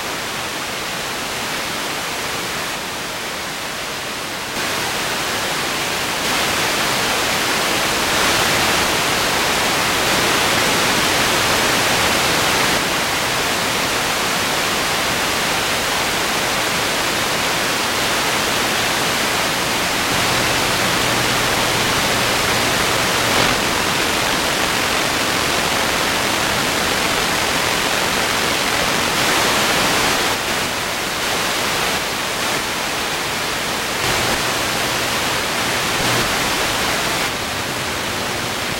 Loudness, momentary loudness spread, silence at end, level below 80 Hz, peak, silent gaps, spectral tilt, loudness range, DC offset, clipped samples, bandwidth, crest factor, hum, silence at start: -17 LUFS; 7 LU; 0 s; -42 dBFS; -2 dBFS; none; -2 dB/octave; 5 LU; under 0.1%; under 0.1%; 16.5 kHz; 18 dB; none; 0 s